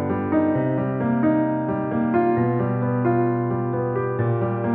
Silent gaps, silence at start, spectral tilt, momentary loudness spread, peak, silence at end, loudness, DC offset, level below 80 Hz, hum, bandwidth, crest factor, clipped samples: none; 0 s; -9.5 dB/octave; 4 LU; -8 dBFS; 0 s; -22 LUFS; under 0.1%; -54 dBFS; none; 3.8 kHz; 12 dB; under 0.1%